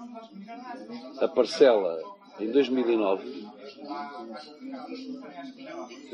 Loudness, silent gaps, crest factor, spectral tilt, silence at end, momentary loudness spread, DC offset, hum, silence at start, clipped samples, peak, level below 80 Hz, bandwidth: -26 LUFS; none; 22 dB; -5 dB/octave; 0 s; 22 LU; under 0.1%; none; 0 s; under 0.1%; -6 dBFS; -86 dBFS; 10 kHz